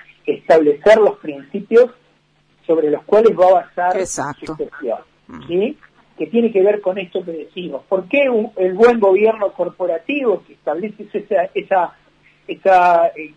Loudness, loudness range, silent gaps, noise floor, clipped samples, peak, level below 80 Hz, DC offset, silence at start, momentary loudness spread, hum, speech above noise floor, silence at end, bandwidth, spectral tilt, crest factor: -16 LUFS; 5 LU; none; -58 dBFS; under 0.1%; -2 dBFS; -56 dBFS; under 0.1%; 0.25 s; 16 LU; none; 42 dB; 0.1 s; 10.5 kHz; -5 dB/octave; 14 dB